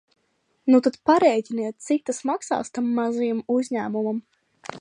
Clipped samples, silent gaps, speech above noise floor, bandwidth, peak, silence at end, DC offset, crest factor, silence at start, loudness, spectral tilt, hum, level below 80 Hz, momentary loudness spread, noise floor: under 0.1%; none; 48 dB; 10 kHz; -4 dBFS; 0 s; under 0.1%; 18 dB; 0.65 s; -23 LUFS; -5 dB/octave; none; -70 dBFS; 11 LU; -70 dBFS